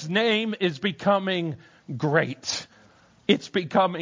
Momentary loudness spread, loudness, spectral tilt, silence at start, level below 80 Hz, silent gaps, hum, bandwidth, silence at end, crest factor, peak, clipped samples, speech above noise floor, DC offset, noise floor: 10 LU; -25 LUFS; -5 dB/octave; 0 s; -66 dBFS; none; none; 7.6 kHz; 0 s; 20 dB; -4 dBFS; under 0.1%; 32 dB; under 0.1%; -56 dBFS